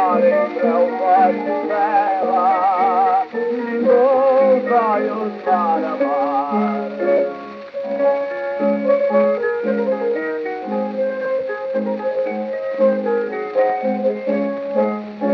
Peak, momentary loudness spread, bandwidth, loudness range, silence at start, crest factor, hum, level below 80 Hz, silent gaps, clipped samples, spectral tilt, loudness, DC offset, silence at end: -4 dBFS; 8 LU; 5.8 kHz; 5 LU; 0 s; 14 dB; none; -72 dBFS; none; under 0.1%; -8.5 dB/octave; -18 LUFS; under 0.1%; 0 s